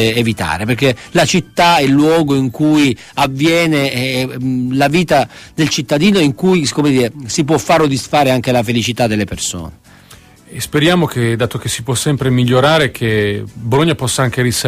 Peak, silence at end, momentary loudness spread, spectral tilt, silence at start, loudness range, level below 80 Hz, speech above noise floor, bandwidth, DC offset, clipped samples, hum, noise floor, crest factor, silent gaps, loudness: 0 dBFS; 0 s; 7 LU; -5 dB/octave; 0 s; 4 LU; -42 dBFS; 28 dB; 15.5 kHz; under 0.1%; under 0.1%; none; -41 dBFS; 14 dB; none; -14 LUFS